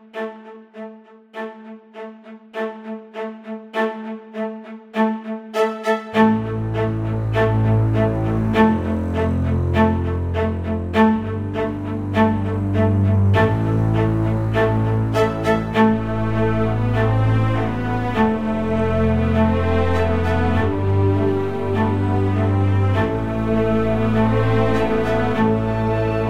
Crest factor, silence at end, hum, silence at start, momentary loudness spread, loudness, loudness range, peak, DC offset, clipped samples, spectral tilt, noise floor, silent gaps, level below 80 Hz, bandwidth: 16 dB; 0 s; none; 0 s; 14 LU; -19 LUFS; 8 LU; -2 dBFS; under 0.1%; under 0.1%; -8.5 dB/octave; -41 dBFS; none; -34 dBFS; 8.2 kHz